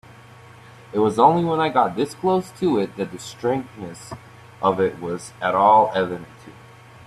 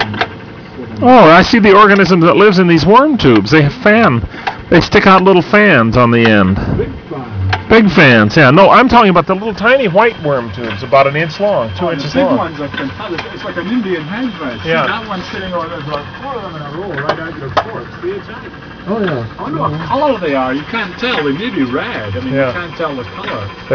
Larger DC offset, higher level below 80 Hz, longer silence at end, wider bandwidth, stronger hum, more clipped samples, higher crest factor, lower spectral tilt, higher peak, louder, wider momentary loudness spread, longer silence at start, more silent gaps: neither; second, -60 dBFS vs -36 dBFS; about the same, 0.05 s vs 0 s; first, 13.5 kHz vs 5.4 kHz; neither; second, under 0.1% vs 0.7%; first, 18 dB vs 12 dB; about the same, -6 dB/octave vs -7 dB/octave; about the same, -2 dBFS vs 0 dBFS; second, -20 LUFS vs -11 LUFS; first, 19 LU vs 16 LU; first, 0.95 s vs 0 s; neither